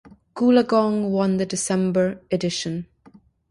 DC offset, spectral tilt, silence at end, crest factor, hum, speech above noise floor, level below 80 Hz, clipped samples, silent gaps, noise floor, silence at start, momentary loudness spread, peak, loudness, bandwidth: under 0.1%; -5.5 dB/octave; 0.65 s; 18 dB; none; 32 dB; -58 dBFS; under 0.1%; none; -53 dBFS; 0.05 s; 10 LU; -4 dBFS; -21 LUFS; 11.5 kHz